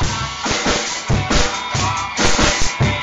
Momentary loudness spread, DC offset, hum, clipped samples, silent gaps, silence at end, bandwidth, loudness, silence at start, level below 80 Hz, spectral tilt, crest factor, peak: 5 LU; under 0.1%; none; under 0.1%; none; 0 s; 11 kHz; -17 LUFS; 0 s; -28 dBFS; -3 dB/octave; 16 dB; 0 dBFS